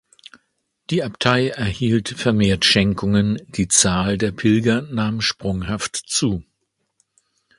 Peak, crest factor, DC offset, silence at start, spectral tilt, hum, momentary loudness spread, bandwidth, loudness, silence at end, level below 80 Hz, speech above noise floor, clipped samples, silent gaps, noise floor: 0 dBFS; 20 dB; under 0.1%; 0.9 s; -4 dB/octave; none; 9 LU; 11.5 kHz; -19 LUFS; 1.15 s; -42 dBFS; 54 dB; under 0.1%; none; -73 dBFS